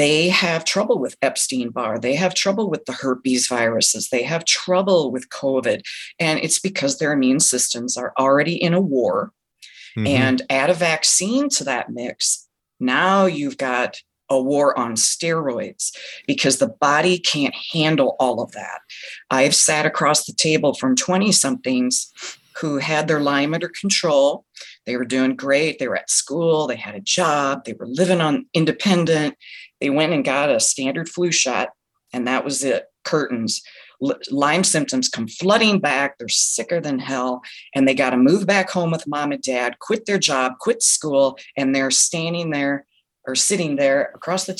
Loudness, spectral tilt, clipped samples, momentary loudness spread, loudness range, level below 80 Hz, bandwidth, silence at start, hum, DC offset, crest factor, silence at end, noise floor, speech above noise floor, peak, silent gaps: -19 LUFS; -3 dB/octave; under 0.1%; 10 LU; 2 LU; -66 dBFS; 13 kHz; 0 s; none; under 0.1%; 16 dB; 0.05 s; -45 dBFS; 25 dB; -4 dBFS; none